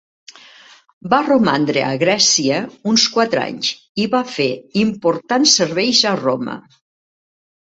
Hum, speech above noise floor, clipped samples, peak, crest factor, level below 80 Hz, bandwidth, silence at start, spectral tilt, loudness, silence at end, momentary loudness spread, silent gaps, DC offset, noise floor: none; 29 dB; under 0.1%; 0 dBFS; 18 dB; -60 dBFS; 8.2 kHz; 1.05 s; -3 dB/octave; -16 LUFS; 1.15 s; 9 LU; 3.89-3.95 s; under 0.1%; -45 dBFS